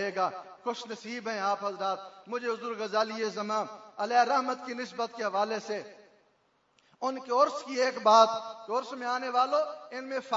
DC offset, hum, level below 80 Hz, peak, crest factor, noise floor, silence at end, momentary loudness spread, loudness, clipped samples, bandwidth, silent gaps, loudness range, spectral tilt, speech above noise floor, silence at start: under 0.1%; none; -86 dBFS; -6 dBFS; 24 dB; -70 dBFS; 0 s; 13 LU; -30 LUFS; under 0.1%; 7.8 kHz; none; 6 LU; -3 dB/octave; 40 dB; 0 s